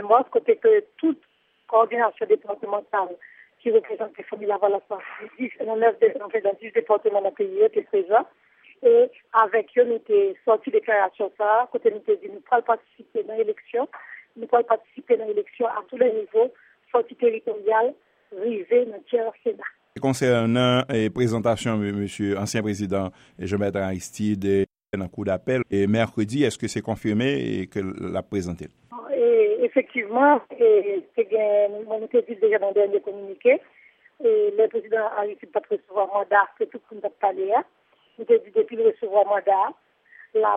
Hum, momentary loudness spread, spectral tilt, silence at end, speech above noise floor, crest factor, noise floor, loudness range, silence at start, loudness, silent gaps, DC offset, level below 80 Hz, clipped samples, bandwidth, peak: none; 11 LU; -6 dB/octave; 0 s; 30 dB; 18 dB; -52 dBFS; 4 LU; 0 s; -23 LUFS; none; under 0.1%; -62 dBFS; under 0.1%; 11 kHz; -4 dBFS